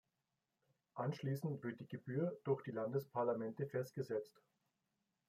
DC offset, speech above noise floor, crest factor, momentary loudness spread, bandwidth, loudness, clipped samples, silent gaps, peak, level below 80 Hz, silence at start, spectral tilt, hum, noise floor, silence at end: under 0.1%; 47 dB; 18 dB; 7 LU; 15.5 kHz; -43 LUFS; under 0.1%; none; -26 dBFS; -86 dBFS; 0.95 s; -8 dB/octave; none; -89 dBFS; 1 s